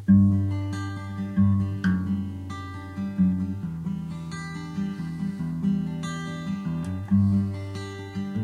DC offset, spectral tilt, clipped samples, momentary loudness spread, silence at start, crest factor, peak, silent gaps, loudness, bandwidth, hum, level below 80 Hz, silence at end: under 0.1%; -8 dB/octave; under 0.1%; 12 LU; 0 s; 16 dB; -8 dBFS; none; -27 LUFS; 10 kHz; none; -52 dBFS; 0 s